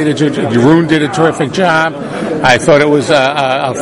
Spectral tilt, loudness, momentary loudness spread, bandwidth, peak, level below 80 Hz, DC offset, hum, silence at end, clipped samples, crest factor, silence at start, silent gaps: -5.5 dB/octave; -10 LUFS; 5 LU; 11.5 kHz; 0 dBFS; -44 dBFS; under 0.1%; none; 0 s; 0.2%; 10 dB; 0 s; none